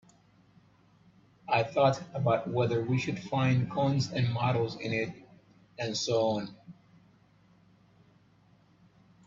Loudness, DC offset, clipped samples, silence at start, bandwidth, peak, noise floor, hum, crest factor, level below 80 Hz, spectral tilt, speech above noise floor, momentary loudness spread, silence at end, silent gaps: -30 LUFS; under 0.1%; under 0.1%; 1.5 s; 7.6 kHz; -12 dBFS; -63 dBFS; none; 20 dB; -66 dBFS; -6 dB/octave; 34 dB; 9 LU; 2.55 s; none